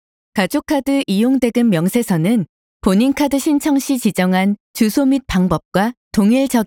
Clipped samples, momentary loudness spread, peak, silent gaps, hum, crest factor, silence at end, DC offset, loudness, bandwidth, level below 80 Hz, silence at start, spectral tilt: under 0.1%; 4 LU; -2 dBFS; 2.49-2.80 s, 4.60-4.74 s, 5.65-5.72 s, 5.97-6.11 s; none; 14 dB; 0 s; under 0.1%; -16 LUFS; 19 kHz; -42 dBFS; 0.35 s; -6 dB/octave